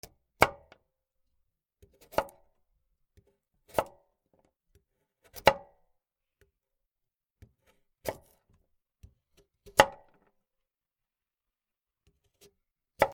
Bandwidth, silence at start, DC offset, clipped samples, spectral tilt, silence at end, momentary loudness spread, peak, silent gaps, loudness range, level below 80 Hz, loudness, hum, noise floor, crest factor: 19.5 kHz; 0.4 s; under 0.1%; under 0.1%; -3 dB/octave; 0 s; 21 LU; 0 dBFS; none; 16 LU; -60 dBFS; -29 LUFS; none; under -90 dBFS; 36 dB